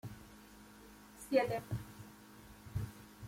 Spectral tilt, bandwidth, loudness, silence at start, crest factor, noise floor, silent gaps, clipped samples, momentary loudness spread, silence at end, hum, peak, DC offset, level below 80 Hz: -6 dB/octave; 16.5 kHz; -39 LUFS; 0.05 s; 22 dB; -58 dBFS; none; under 0.1%; 23 LU; 0 s; none; -18 dBFS; under 0.1%; -60 dBFS